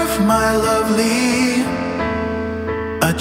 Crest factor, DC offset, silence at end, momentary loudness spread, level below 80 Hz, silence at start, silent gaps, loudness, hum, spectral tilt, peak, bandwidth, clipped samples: 16 dB; under 0.1%; 0 s; 8 LU; -38 dBFS; 0 s; none; -17 LUFS; none; -4.5 dB/octave; -2 dBFS; 16.5 kHz; under 0.1%